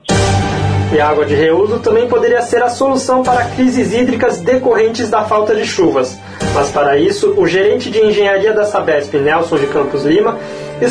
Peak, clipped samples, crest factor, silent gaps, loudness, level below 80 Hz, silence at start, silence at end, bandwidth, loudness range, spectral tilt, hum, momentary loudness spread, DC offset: -2 dBFS; under 0.1%; 10 dB; none; -13 LUFS; -36 dBFS; 0.05 s; 0 s; 10.5 kHz; 1 LU; -5.5 dB/octave; none; 4 LU; under 0.1%